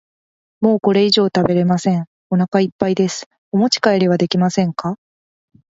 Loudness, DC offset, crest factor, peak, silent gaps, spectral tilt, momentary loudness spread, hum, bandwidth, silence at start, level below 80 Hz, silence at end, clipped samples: -17 LUFS; under 0.1%; 16 dB; 0 dBFS; 2.07-2.30 s, 2.48-2.52 s, 2.72-2.79 s, 3.26-3.31 s, 3.38-3.52 s; -6 dB/octave; 8 LU; none; 7.8 kHz; 0.6 s; -56 dBFS; 0.85 s; under 0.1%